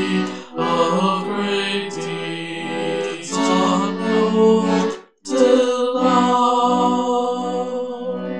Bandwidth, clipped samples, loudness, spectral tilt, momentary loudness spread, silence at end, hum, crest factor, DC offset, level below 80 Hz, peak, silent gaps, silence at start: 10.5 kHz; under 0.1%; -19 LUFS; -5 dB/octave; 11 LU; 0 s; none; 16 dB; 0.4%; -70 dBFS; -2 dBFS; none; 0 s